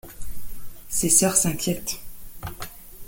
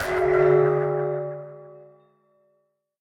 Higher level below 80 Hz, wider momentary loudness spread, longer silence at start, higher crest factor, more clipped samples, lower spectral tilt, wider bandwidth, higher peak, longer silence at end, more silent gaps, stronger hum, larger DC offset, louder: first, -42 dBFS vs -54 dBFS; first, 25 LU vs 18 LU; about the same, 0.05 s vs 0 s; first, 22 dB vs 16 dB; neither; second, -3 dB/octave vs -7.5 dB/octave; first, 17 kHz vs 14 kHz; first, -4 dBFS vs -8 dBFS; second, 0 s vs 1.25 s; neither; neither; neither; about the same, -21 LUFS vs -22 LUFS